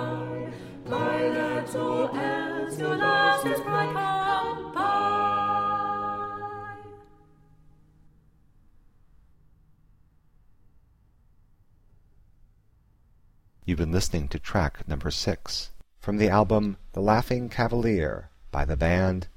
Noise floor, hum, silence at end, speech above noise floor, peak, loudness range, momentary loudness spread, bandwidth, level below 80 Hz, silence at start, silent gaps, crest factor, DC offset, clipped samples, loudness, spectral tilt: -61 dBFS; none; 0.05 s; 36 dB; -8 dBFS; 10 LU; 13 LU; 16 kHz; -40 dBFS; 0 s; none; 20 dB; under 0.1%; under 0.1%; -26 LUFS; -5.5 dB/octave